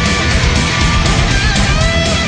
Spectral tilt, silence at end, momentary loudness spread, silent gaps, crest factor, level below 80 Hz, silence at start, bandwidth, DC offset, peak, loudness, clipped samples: -4 dB/octave; 0 s; 0 LU; none; 12 dB; -18 dBFS; 0 s; 10.5 kHz; under 0.1%; 0 dBFS; -12 LUFS; under 0.1%